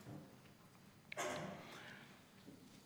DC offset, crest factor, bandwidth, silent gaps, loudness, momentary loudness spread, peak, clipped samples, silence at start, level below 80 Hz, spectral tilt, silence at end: under 0.1%; 22 dB; over 20 kHz; none; -51 LUFS; 19 LU; -30 dBFS; under 0.1%; 0 s; -84 dBFS; -3.5 dB/octave; 0 s